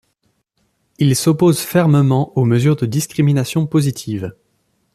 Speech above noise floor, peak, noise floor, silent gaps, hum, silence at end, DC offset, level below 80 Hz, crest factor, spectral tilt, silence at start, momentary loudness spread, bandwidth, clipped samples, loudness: 51 dB; -2 dBFS; -66 dBFS; none; none; 0.65 s; under 0.1%; -52 dBFS; 14 dB; -6.5 dB/octave; 1 s; 9 LU; 14.5 kHz; under 0.1%; -16 LUFS